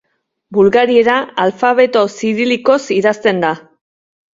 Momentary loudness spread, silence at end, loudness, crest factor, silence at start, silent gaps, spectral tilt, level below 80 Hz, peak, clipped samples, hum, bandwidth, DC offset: 6 LU; 0.75 s; -13 LUFS; 14 dB; 0.5 s; none; -5 dB/octave; -56 dBFS; 0 dBFS; under 0.1%; none; 7.8 kHz; under 0.1%